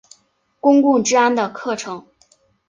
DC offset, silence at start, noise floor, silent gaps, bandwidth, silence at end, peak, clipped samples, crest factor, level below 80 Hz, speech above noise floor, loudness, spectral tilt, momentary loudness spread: under 0.1%; 0.65 s; -61 dBFS; none; 9.4 kHz; 0.7 s; -2 dBFS; under 0.1%; 16 dB; -66 dBFS; 45 dB; -17 LUFS; -3.5 dB/octave; 14 LU